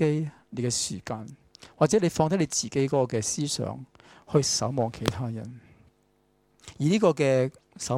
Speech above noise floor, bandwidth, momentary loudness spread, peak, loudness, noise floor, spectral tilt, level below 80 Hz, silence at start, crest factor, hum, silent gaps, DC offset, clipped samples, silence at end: 41 dB; 16 kHz; 14 LU; -6 dBFS; -26 LUFS; -67 dBFS; -5 dB/octave; -58 dBFS; 0 s; 22 dB; none; none; under 0.1%; under 0.1%; 0 s